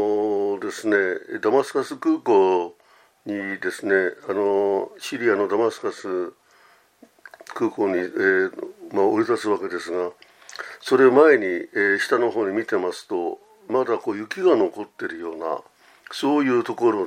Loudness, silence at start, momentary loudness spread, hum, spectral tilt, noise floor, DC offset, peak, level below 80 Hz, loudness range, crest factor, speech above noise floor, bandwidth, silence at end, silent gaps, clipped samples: -22 LUFS; 0 s; 13 LU; none; -5 dB/octave; -57 dBFS; under 0.1%; -2 dBFS; -76 dBFS; 5 LU; 20 dB; 35 dB; 14 kHz; 0 s; none; under 0.1%